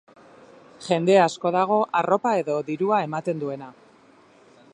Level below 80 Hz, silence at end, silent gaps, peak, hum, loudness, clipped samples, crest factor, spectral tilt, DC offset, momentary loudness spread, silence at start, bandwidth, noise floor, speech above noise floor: -74 dBFS; 1 s; none; -4 dBFS; none; -22 LUFS; under 0.1%; 20 dB; -6 dB/octave; under 0.1%; 14 LU; 0.8 s; 10.5 kHz; -54 dBFS; 32 dB